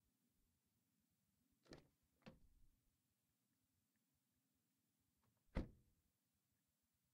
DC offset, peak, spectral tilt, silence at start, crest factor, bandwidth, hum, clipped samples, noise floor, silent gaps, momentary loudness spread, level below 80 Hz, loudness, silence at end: under 0.1%; -30 dBFS; -7 dB/octave; 1.65 s; 34 dB; 15.5 kHz; none; under 0.1%; -90 dBFS; none; 15 LU; -68 dBFS; -57 LUFS; 1.35 s